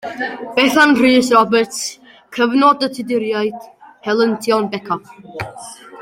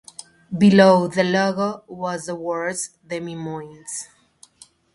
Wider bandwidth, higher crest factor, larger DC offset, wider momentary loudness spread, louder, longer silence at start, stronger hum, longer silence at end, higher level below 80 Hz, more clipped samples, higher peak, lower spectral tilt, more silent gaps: first, 16.5 kHz vs 11.5 kHz; about the same, 16 dB vs 20 dB; neither; about the same, 18 LU vs 19 LU; first, -15 LUFS vs -20 LUFS; second, 0.05 s vs 0.5 s; neither; second, 0 s vs 0.9 s; about the same, -58 dBFS vs -62 dBFS; neither; about the same, 0 dBFS vs 0 dBFS; second, -3.5 dB/octave vs -5.5 dB/octave; neither